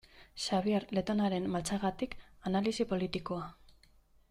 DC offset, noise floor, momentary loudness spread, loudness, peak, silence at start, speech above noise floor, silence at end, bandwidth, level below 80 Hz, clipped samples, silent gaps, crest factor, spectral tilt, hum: under 0.1%; -64 dBFS; 9 LU; -34 LUFS; -18 dBFS; 0.15 s; 31 dB; 0.6 s; 13.5 kHz; -58 dBFS; under 0.1%; none; 16 dB; -5.5 dB/octave; none